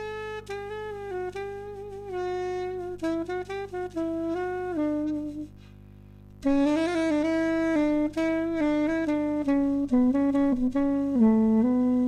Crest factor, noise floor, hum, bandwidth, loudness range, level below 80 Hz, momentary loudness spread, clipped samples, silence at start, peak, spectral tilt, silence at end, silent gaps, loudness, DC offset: 14 dB; -48 dBFS; 50 Hz at -50 dBFS; 9.8 kHz; 9 LU; -50 dBFS; 13 LU; under 0.1%; 0 s; -12 dBFS; -7 dB/octave; 0 s; none; -27 LUFS; under 0.1%